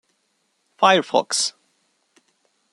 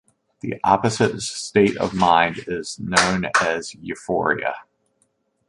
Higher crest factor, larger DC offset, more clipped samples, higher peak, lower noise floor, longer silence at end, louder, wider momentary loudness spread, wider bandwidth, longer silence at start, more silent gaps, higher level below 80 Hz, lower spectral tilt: about the same, 22 dB vs 20 dB; neither; neither; about the same, -2 dBFS vs -2 dBFS; about the same, -69 dBFS vs -68 dBFS; first, 1.25 s vs 0.85 s; about the same, -19 LUFS vs -20 LUFS; second, 6 LU vs 13 LU; about the same, 12.5 kHz vs 11.5 kHz; first, 0.8 s vs 0.45 s; neither; second, -76 dBFS vs -52 dBFS; second, -2 dB/octave vs -4 dB/octave